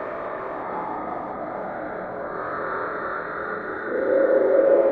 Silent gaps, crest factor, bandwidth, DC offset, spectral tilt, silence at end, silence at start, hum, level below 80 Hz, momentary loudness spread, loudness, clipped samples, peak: none; 18 dB; 4.5 kHz; under 0.1%; -9 dB/octave; 0 s; 0 s; none; -60 dBFS; 13 LU; -25 LUFS; under 0.1%; -6 dBFS